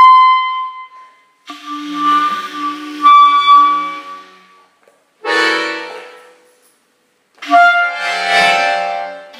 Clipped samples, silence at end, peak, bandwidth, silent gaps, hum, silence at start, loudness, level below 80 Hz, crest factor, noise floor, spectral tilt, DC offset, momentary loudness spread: under 0.1%; 0 s; 0 dBFS; 15 kHz; none; none; 0 s; -11 LUFS; -78 dBFS; 14 dB; -59 dBFS; -1.5 dB/octave; under 0.1%; 21 LU